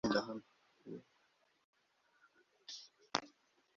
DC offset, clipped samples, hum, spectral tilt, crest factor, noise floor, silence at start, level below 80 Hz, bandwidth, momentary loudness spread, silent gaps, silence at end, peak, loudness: under 0.1%; under 0.1%; none; -2.5 dB/octave; 32 dB; -76 dBFS; 0.05 s; -74 dBFS; 7.4 kHz; 21 LU; 1.64-1.73 s; 0.5 s; -14 dBFS; -44 LUFS